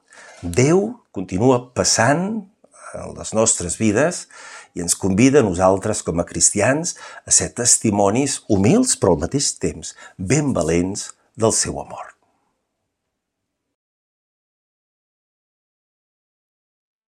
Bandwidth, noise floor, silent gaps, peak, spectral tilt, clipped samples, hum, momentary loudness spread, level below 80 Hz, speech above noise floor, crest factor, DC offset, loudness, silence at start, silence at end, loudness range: 15.5 kHz; -78 dBFS; none; -2 dBFS; -4 dB/octave; under 0.1%; none; 18 LU; -50 dBFS; 60 dB; 20 dB; under 0.1%; -18 LUFS; 0.3 s; 5 s; 7 LU